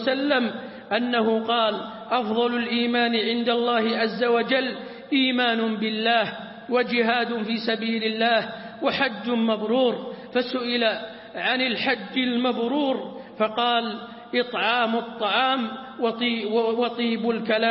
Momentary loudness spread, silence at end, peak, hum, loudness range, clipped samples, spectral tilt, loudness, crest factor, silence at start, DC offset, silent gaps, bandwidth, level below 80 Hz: 6 LU; 0 s; -6 dBFS; none; 2 LU; under 0.1%; -9 dB/octave; -23 LUFS; 16 dB; 0 s; under 0.1%; none; 5.8 kHz; -70 dBFS